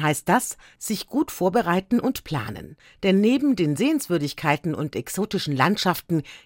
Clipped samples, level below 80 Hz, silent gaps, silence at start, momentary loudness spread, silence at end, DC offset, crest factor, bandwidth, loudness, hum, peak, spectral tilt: under 0.1%; -56 dBFS; none; 0 s; 10 LU; 0.1 s; under 0.1%; 20 dB; 17 kHz; -23 LUFS; none; -4 dBFS; -5 dB/octave